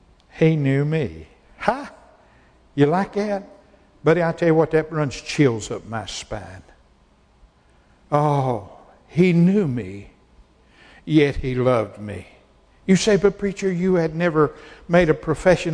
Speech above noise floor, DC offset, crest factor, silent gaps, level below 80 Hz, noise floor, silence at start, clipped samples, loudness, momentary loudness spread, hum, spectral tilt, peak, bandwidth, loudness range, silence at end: 37 dB; under 0.1%; 20 dB; none; -44 dBFS; -56 dBFS; 0.35 s; under 0.1%; -20 LUFS; 15 LU; none; -6.5 dB/octave; -2 dBFS; 10.5 kHz; 5 LU; 0 s